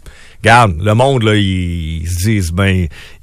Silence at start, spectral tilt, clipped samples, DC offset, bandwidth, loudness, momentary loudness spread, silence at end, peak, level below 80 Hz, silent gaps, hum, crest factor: 0.05 s; -5.5 dB/octave; under 0.1%; under 0.1%; 15.5 kHz; -13 LUFS; 11 LU; 0.15 s; 0 dBFS; -30 dBFS; none; none; 12 dB